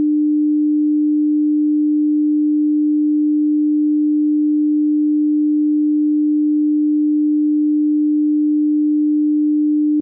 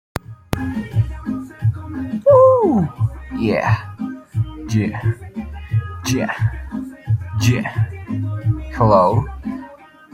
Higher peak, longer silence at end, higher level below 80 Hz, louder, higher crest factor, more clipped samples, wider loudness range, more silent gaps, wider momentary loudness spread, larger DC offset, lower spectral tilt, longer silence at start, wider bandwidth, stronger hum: second, -12 dBFS vs -2 dBFS; second, 0 s vs 0.3 s; second, -84 dBFS vs -38 dBFS; first, -16 LUFS vs -19 LUFS; second, 4 dB vs 18 dB; neither; second, 0 LU vs 5 LU; neither; second, 0 LU vs 16 LU; neither; first, -17 dB/octave vs -7 dB/octave; second, 0 s vs 0.3 s; second, 0.5 kHz vs 14.5 kHz; neither